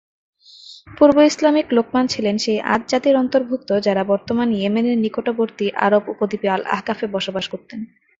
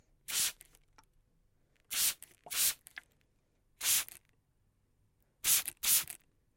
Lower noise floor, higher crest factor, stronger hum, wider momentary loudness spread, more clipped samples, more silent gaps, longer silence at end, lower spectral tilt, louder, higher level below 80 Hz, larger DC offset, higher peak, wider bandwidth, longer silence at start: second, -43 dBFS vs -74 dBFS; second, 16 dB vs 22 dB; neither; second, 9 LU vs 17 LU; neither; neither; about the same, 0.35 s vs 0.4 s; first, -5 dB/octave vs 2.5 dB/octave; first, -18 LUFS vs -31 LUFS; first, -56 dBFS vs -70 dBFS; neither; first, -2 dBFS vs -14 dBFS; second, 8 kHz vs 17 kHz; first, 0.65 s vs 0.3 s